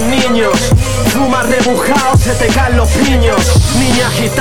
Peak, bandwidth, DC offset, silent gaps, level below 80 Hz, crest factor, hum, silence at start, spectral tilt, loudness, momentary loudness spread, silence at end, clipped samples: 0 dBFS; 17.5 kHz; 6%; none; -18 dBFS; 10 dB; none; 0 s; -4.5 dB/octave; -11 LUFS; 2 LU; 0 s; under 0.1%